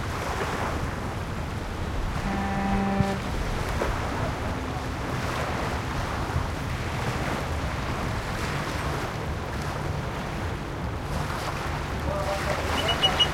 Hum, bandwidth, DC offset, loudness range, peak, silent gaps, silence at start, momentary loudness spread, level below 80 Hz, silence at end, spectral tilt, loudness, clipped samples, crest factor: none; 16.5 kHz; under 0.1%; 2 LU; -8 dBFS; none; 0 s; 6 LU; -36 dBFS; 0 s; -5 dB/octave; -29 LUFS; under 0.1%; 20 dB